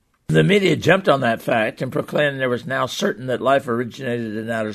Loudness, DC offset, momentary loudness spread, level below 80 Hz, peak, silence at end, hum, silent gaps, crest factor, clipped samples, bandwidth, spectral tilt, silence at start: -20 LUFS; under 0.1%; 9 LU; -56 dBFS; -2 dBFS; 0 s; none; none; 18 dB; under 0.1%; 13.5 kHz; -5.5 dB/octave; 0.3 s